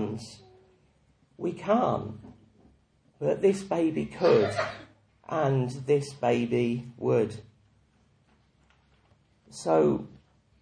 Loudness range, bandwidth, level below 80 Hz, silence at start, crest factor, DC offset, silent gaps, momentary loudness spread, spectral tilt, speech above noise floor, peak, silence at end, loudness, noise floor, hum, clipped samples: 6 LU; 10.5 kHz; -62 dBFS; 0 s; 20 dB; under 0.1%; none; 17 LU; -7 dB/octave; 38 dB; -10 dBFS; 0.55 s; -27 LUFS; -65 dBFS; none; under 0.1%